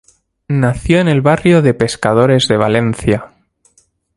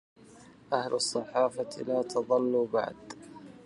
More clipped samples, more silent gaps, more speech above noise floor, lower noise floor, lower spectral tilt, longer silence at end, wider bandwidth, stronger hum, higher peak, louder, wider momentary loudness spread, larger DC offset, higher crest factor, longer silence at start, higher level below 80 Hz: neither; neither; first, 43 dB vs 25 dB; about the same, -55 dBFS vs -54 dBFS; first, -6.5 dB/octave vs -3.5 dB/octave; first, 0.9 s vs 0.05 s; about the same, 11.5 kHz vs 11.5 kHz; neither; first, 0 dBFS vs -10 dBFS; first, -13 LUFS vs -30 LUFS; second, 6 LU vs 19 LU; neither; second, 14 dB vs 20 dB; first, 0.5 s vs 0.35 s; first, -38 dBFS vs -72 dBFS